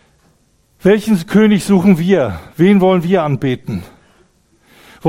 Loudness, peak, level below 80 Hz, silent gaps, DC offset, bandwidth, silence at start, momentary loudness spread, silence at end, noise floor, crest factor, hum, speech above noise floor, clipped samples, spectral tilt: -13 LUFS; 0 dBFS; -46 dBFS; none; under 0.1%; 15.5 kHz; 0.85 s; 10 LU; 0 s; -56 dBFS; 14 dB; none; 43 dB; under 0.1%; -7 dB/octave